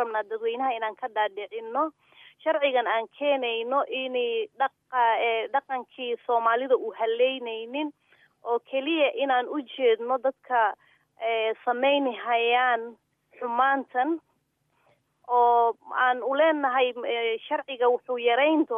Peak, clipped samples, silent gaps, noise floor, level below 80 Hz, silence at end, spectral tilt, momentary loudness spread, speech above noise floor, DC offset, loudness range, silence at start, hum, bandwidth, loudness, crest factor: -10 dBFS; under 0.1%; none; -72 dBFS; -90 dBFS; 0 s; -5 dB/octave; 10 LU; 46 dB; under 0.1%; 3 LU; 0 s; none; 3.8 kHz; -26 LUFS; 16 dB